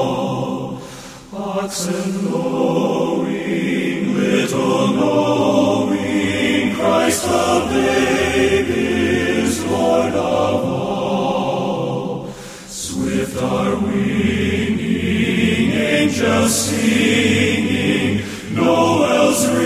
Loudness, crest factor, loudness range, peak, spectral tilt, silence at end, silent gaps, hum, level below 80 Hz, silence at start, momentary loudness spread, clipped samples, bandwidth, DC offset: -17 LUFS; 16 dB; 5 LU; -2 dBFS; -4.5 dB/octave; 0 s; none; none; -40 dBFS; 0 s; 8 LU; under 0.1%; 16 kHz; under 0.1%